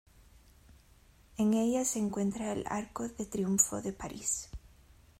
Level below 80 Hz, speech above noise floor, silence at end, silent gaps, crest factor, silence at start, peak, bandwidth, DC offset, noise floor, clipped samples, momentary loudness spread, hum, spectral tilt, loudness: -58 dBFS; 29 dB; 0.55 s; none; 24 dB; 0.7 s; -10 dBFS; 16 kHz; under 0.1%; -61 dBFS; under 0.1%; 12 LU; none; -4.5 dB/octave; -32 LUFS